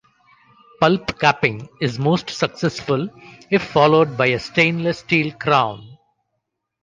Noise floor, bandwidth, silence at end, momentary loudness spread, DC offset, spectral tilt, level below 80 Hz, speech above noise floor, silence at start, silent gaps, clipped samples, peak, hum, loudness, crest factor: -76 dBFS; 9.6 kHz; 0.9 s; 8 LU; under 0.1%; -6 dB/octave; -54 dBFS; 58 dB; 0.8 s; none; under 0.1%; -2 dBFS; none; -19 LUFS; 18 dB